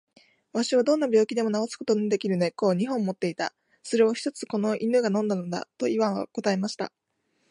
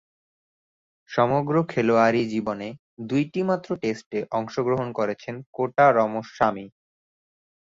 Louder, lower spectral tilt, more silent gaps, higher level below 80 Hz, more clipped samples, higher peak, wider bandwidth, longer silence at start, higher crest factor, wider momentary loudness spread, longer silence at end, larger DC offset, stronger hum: about the same, -26 LUFS vs -24 LUFS; second, -5.5 dB/octave vs -7 dB/octave; second, none vs 2.79-2.97 s, 4.06-4.11 s, 5.46-5.53 s; second, -76 dBFS vs -62 dBFS; neither; second, -10 dBFS vs -6 dBFS; first, 11 kHz vs 7.6 kHz; second, 0.55 s vs 1.1 s; about the same, 16 dB vs 20 dB; second, 9 LU vs 12 LU; second, 0.65 s vs 0.95 s; neither; neither